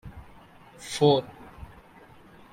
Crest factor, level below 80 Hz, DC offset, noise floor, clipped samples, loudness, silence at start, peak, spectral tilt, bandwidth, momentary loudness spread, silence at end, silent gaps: 22 dB; -54 dBFS; under 0.1%; -52 dBFS; under 0.1%; -24 LUFS; 0.05 s; -8 dBFS; -5.5 dB/octave; 16 kHz; 26 LU; 1.1 s; none